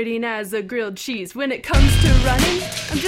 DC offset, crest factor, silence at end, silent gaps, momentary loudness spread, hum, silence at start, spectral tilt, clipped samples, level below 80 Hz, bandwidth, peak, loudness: under 0.1%; 18 dB; 0 s; none; 11 LU; none; 0 s; -5 dB/octave; under 0.1%; -22 dBFS; 16.5 kHz; 0 dBFS; -19 LUFS